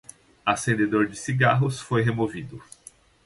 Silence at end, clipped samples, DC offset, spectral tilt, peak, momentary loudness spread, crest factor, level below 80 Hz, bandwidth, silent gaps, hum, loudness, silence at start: 0.6 s; under 0.1%; under 0.1%; -6 dB/octave; -6 dBFS; 13 LU; 18 dB; -56 dBFS; 11.5 kHz; none; none; -24 LUFS; 0.45 s